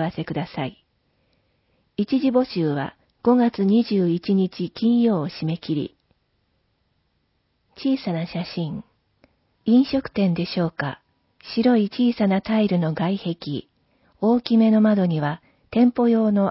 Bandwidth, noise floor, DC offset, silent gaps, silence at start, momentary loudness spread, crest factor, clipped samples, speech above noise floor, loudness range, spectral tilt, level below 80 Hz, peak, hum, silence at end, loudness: 5.8 kHz; -69 dBFS; under 0.1%; none; 0 s; 12 LU; 16 dB; under 0.1%; 49 dB; 9 LU; -11.5 dB/octave; -58 dBFS; -6 dBFS; none; 0 s; -22 LUFS